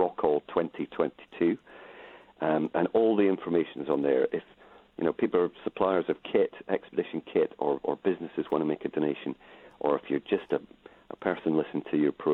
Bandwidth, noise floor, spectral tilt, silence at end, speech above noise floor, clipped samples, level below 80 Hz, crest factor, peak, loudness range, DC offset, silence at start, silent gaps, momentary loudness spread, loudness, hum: 4.2 kHz; -50 dBFS; -9 dB/octave; 0 s; 22 dB; under 0.1%; -68 dBFS; 18 dB; -10 dBFS; 3 LU; under 0.1%; 0 s; none; 8 LU; -29 LUFS; none